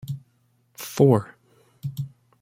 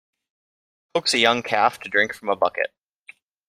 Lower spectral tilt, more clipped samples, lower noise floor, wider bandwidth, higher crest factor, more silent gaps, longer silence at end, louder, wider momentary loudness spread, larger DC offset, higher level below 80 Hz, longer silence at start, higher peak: first, -7.5 dB/octave vs -2 dB/octave; neither; first, -65 dBFS vs -51 dBFS; about the same, 16.5 kHz vs 15.5 kHz; about the same, 22 dB vs 22 dB; neither; second, 0.35 s vs 0.8 s; about the same, -23 LUFS vs -21 LUFS; first, 19 LU vs 10 LU; neither; about the same, -64 dBFS vs -68 dBFS; second, 0.05 s vs 0.95 s; about the same, -4 dBFS vs -2 dBFS